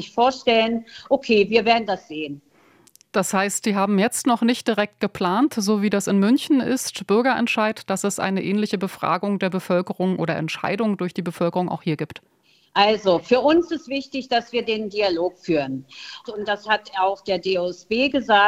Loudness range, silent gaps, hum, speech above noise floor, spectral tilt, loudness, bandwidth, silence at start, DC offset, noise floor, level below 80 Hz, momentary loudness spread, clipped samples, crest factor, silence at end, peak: 3 LU; none; none; 33 dB; -4.5 dB/octave; -21 LUFS; 16 kHz; 0 s; under 0.1%; -54 dBFS; -60 dBFS; 9 LU; under 0.1%; 20 dB; 0 s; -2 dBFS